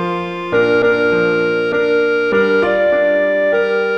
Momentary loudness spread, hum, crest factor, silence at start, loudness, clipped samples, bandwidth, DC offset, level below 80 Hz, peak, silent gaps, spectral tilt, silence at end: 3 LU; none; 12 dB; 0 s; -14 LUFS; under 0.1%; 7 kHz; 0.2%; -52 dBFS; -2 dBFS; none; -6.5 dB/octave; 0 s